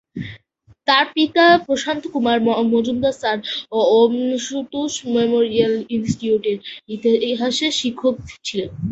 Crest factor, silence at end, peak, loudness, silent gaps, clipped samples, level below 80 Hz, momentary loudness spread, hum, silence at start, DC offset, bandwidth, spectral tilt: 18 dB; 0 s; -2 dBFS; -18 LUFS; none; under 0.1%; -52 dBFS; 11 LU; none; 0.15 s; under 0.1%; 8.2 kHz; -4 dB/octave